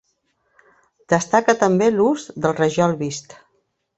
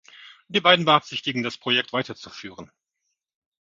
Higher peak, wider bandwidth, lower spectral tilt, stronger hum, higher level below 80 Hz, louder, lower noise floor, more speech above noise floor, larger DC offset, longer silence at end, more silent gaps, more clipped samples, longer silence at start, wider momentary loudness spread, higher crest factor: about the same, -2 dBFS vs 0 dBFS; first, 8.4 kHz vs 7.6 kHz; about the same, -5.5 dB/octave vs -4.5 dB/octave; neither; first, -60 dBFS vs -68 dBFS; about the same, -19 LUFS vs -21 LUFS; second, -68 dBFS vs -79 dBFS; second, 50 dB vs 56 dB; neither; second, 0.8 s vs 1 s; neither; neither; first, 1.1 s vs 0.2 s; second, 9 LU vs 21 LU; about the same, 20 dB vs 24 dB